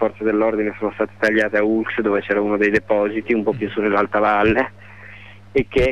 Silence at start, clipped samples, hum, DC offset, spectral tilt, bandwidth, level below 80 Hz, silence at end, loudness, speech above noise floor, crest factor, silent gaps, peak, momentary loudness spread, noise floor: 0 s; under 0.1%; none; 0.5%; -7 dB/octave; 9.6 kHz; -42 dBFS; 0 s; -19 LUFS; 22 dB; 14 dB; none; -6 dBFS; 7 LU; -41 dBFS